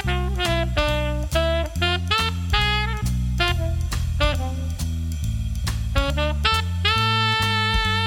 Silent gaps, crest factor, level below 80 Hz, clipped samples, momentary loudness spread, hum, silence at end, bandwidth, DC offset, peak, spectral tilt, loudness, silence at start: none; 16 dB; -26 dBFS; under 0.1%; 8 LU; none; 0 s; 17.5 kHz; under 0.1%; -6 dBFS; -4.5 dB/octave; -22 LUFS; 0 s